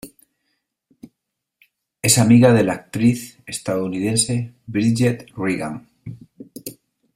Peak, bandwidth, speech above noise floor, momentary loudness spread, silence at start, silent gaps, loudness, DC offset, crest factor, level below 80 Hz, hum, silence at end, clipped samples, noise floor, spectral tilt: 0 dBFS; 16 kHz; 61 dB; 23 LU; 0.05 s; none; -18 LUFS; under 0.1%; 20 dB; -54 dBFS; none; 0.45 s; under 0.1%; -79 dBFS; -5 dB/octave